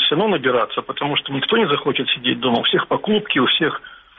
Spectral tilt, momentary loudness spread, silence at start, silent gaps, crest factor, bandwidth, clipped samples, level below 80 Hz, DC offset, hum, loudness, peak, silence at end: -2 dB/octave; 5 LU; 0 s; none; 14 dB; 4.7 kHz; under 0.1%; -58 dBFS; under 0.1%; none; -18 LUFS; -6 dBFS; 0.2 s